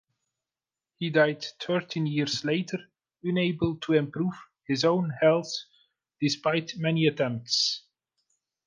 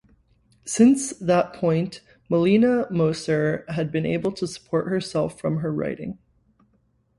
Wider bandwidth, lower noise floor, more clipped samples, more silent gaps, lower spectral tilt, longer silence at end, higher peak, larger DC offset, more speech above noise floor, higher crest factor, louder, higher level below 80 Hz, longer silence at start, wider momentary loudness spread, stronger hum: second, 10 kHz vs 11.5 kHz; first, under -90 dBFS vs -65 dBFS; neither; neither; about the same, -5 dB/octave vs -6 dB/octave; second, 0.9 s vs 1.05 s; second, -8 dBFS vs -4 dBFS; neither; first, over 63 dB vs 43 dB; about the same, 20 dB vs 18 dB; second, -27 LUFS vs -23 LUFS; second, -64 dBFS vs -58 dBFS; first, 1 s vs 0.65 s; about the same, 11 LU vs 13 LU; neither